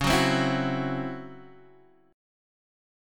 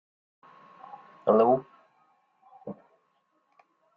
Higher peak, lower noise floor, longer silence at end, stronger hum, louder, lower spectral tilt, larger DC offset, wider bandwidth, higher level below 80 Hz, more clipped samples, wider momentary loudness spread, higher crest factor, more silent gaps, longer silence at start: about the same, -10 dBFS vs -10 dBFS; second, -57 dBFS vs -72 dBFS; second, 0.95 s vs 1.25 s; neither; about the same, -26 LUFS vs -24 LUFS; second, -5 dB/octave vs -7.5 dB/octave; neither; first, 17.5 kHz vs 5 kHz; first, -48 dBFS vs -74 dBFS; neither; second, 18 LU vs 26 LU; about the same, 18 dB vs 22 dB; neither; second, 0 s vs 1.25 s